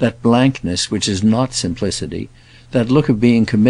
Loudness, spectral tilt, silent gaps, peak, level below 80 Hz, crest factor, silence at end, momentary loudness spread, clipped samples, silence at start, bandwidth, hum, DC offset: -16 LUFS; -5.5 dB/octave; none; -2 dBFS; -42 dBFS; 14 dB; 0 s; 10 LU; under 0.1%; 0 s; 11 kHz; none; under 0.1%